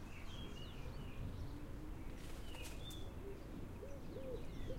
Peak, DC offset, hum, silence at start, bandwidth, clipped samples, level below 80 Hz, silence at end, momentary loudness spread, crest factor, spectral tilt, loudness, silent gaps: -34 dBFS; under 0.1%; none; 0 s; 16 kHz; under 0.1%; -52 dBFS; 0 s; 3 LU; 14 dB; -5.5 dB/octave; -51 LUFS; none